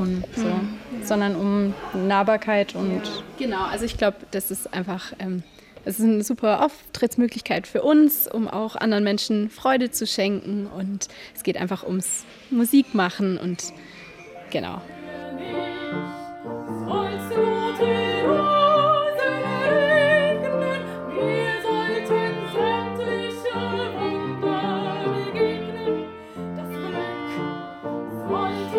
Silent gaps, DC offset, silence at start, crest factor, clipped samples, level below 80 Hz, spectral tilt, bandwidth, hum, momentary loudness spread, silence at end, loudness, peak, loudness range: none; under 0.1%; 0 s; 16 dB; under 0.1%; -54 dBFS; -5 dB/octave; 17 kHz; none; 13 LU; 0 s; -23 LUFS; -6 dBFS; 8 LU